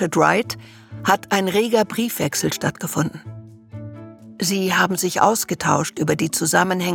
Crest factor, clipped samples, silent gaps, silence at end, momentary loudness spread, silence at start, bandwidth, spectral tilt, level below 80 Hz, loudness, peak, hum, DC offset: 20 dB; under 0.1%; none; 0 s; 20 LU; 0 s; 18 kHz; -4 dB/octave; -58 dBFS; -20 LUFS; -2 dBFS; none; under 0.1%